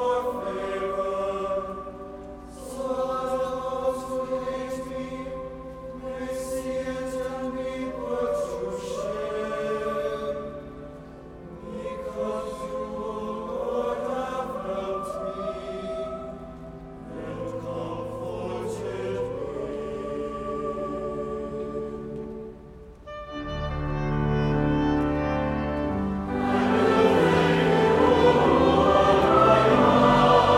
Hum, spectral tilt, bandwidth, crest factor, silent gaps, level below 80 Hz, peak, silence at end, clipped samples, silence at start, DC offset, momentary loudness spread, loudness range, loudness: none; -6.5 dB/octave; 15.5 kHz; 20 dB; none; -42 dBFS; -6 dBFS; 0 s; under 0.1%; 0 s; under 0.1%; 20 LU; 13 LU; -26 LUFS